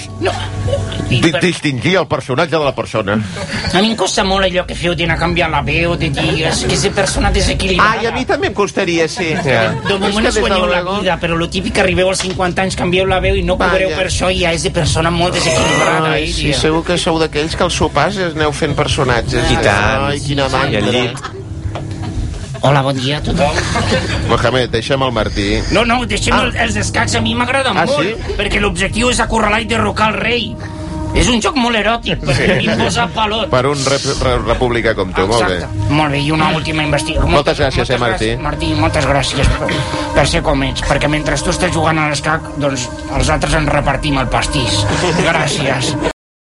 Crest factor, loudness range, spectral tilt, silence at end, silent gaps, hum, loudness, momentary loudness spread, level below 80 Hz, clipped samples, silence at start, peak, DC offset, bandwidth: 14 dB; 2 LU; -4.5 dB/octave; 0.3 s; none; none; -14 LUFS; 5 LU; -26 dBFS; under 0.1%; 0 s; 0 dBFS; under 0.1%; 11.5 kHz